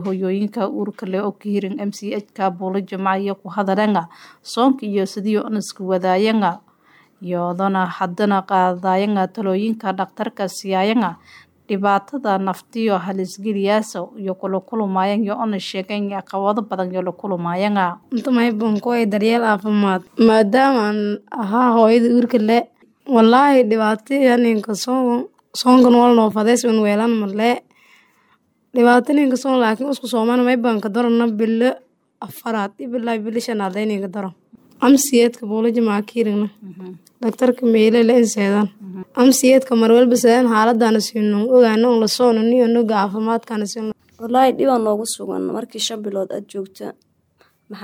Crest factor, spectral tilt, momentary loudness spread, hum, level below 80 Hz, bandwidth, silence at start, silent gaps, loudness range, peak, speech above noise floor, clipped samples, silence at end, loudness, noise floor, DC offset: 14 dB; -5 dB/octave; 12 LU; none; -70 dBFS; 17 kHz; 0 s; none; 7 LU; -4 dBFS; 43 dB; under 0.1%; 0 s; -17 LUFS; -60 dBFS; under 0.1%